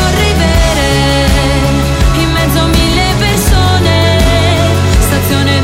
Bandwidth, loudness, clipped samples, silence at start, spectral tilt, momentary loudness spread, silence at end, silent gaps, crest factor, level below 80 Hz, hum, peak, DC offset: 16.5 kHz; -10 LUFS; under 0.1%; 0 s; -5 dB/octave; 2 LU; 0 s; none; 8 dB; -14 dBFS; none; 0 dBFS; under 0.1%